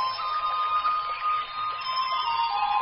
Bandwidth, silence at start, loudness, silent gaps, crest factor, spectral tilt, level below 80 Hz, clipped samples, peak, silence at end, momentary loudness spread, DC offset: 5.6 kHz; 0 s; -26 LUFS; none; 14 dB; 3 dB/octave; -62 dBFS; under 0.1%; -14 dBFS; 0 s; 3 LU; under 0.1%